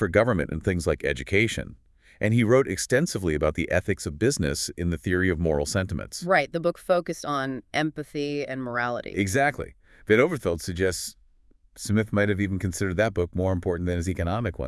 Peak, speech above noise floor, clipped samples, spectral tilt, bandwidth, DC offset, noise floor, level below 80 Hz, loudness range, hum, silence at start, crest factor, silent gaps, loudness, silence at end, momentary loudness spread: -6 dBFS; 33 dB; under 0.1%; -5.5 dB/octave; 12 kHz; under 0.1%; -58 dBFS; -46 dBFS; 2 LU; none; 0 s; 20 dB; none; -25 LUFS; 0 s; 8 LU